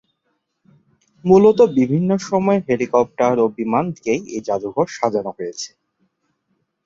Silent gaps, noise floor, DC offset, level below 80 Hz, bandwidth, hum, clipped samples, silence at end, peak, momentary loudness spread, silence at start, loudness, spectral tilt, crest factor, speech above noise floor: none; -71 dBFS; under 0.1%; -58 dBFS; 7.8 kHz; none; under 0.1%; 1.2 s; -2 dBFS; 15 LU; 1.25 s; -18 LUFS; -6.5 dB/octave; 18 dB; 54 dB